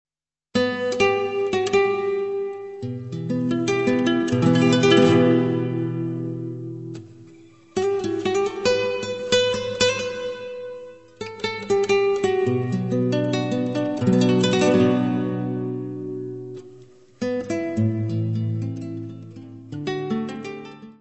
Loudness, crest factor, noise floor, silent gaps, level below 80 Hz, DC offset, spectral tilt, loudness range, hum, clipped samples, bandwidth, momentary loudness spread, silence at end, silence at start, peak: -22 LUFS; 20 dB; -48 dBFS; none; -58 dBFS; 0.1%; -6 dB/octave; 8 LU; none; under 0.1%; 8.4 kHz; 16 LU; 0.1 s; 0.55 s; -4 dBFS